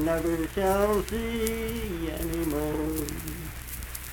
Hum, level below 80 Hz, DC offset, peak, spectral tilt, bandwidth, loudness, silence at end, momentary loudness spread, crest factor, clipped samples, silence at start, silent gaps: none; -38 dBFS; under 0.1%; -6 dBFS; -5 dB/octave; 19 kHz; -29 LUFS; 0 s; 11 LU; 24 dB; under 0.1%; 0 s; none